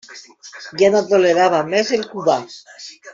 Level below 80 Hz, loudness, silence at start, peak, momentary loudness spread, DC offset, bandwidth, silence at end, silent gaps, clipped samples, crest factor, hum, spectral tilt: -64 dBFS; -16 LUFS; 0.1 s; -4 dBFS; 22 LU; under 0.1%; 7.8 kHz; 0 s; none; under 0.1%; 14 dB; none; -4 dB/octave